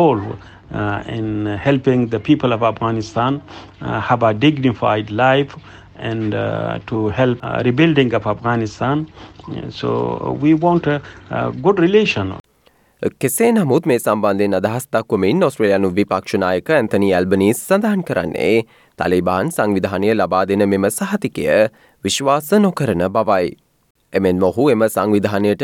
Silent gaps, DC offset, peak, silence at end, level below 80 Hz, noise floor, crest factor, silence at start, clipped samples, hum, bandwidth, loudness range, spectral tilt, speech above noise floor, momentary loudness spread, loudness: 12.40-12.44 s, 23.90-23.95 s; under 0.1%; -2 dBFS; 0 s; -50 dBFS; -55 dBFS; 16 dB; 0 s; under 0.1%; none; 18 kHz; 2 LU; -6 dB/octave; 39 dB; 9 LU; -17 LUFS